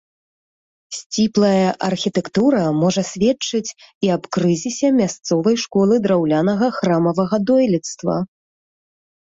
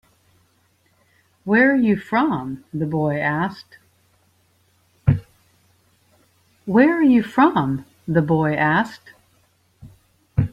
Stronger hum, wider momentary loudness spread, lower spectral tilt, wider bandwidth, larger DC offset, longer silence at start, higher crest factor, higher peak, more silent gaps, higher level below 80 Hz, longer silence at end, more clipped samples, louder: neither; second, 7 LU vs 12 LU; second, -5.5 dB/octave vs -8.5 dB/octave; second, 8 kHz vs 11.5 kHz; neither; second, 0.9 s vs 1.45 s; about the same, 14 dB vs 18 dB; about the same, -4 dBFS vs -2 dBFS; first, 1.06-1.10 s, 3.95-4.01 s vs none; second, -58 dBFS vs -46 dBFS; first, 1 s vs 0.05 s; neither; about the same, -18 LUFS vs -19 LUFS